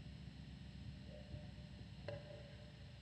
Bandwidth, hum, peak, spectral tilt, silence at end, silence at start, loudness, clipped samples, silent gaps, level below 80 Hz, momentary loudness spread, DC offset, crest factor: 10 kHz; none; -34 dBFS; -6.5 dB/octave; 0 s; 0 s; -55 LUFS; under 0.1%; none; -60 dBFS; 4 LU; under 0.1%; 20 dB